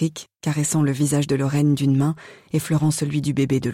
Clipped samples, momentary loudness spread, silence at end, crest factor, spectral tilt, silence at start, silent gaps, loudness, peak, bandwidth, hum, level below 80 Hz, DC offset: under 0.1%; 7 LU; 0 s; 10 dB; -6 dB/octave; 0 s; none; -21 LUFS; -10 dBFS; 16 kHz; none; -54 dBFS; under 0.1%